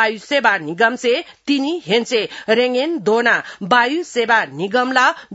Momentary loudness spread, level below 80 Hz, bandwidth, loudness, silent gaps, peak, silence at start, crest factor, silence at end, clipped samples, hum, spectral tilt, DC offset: 5 LU; -68 dBFS; 8 kHz; -17 LUFS; none; 0 dBFS; 0 s; 18 dB; 0 s; under 0.1%; none; -3.5 dB/octave; under 0.1%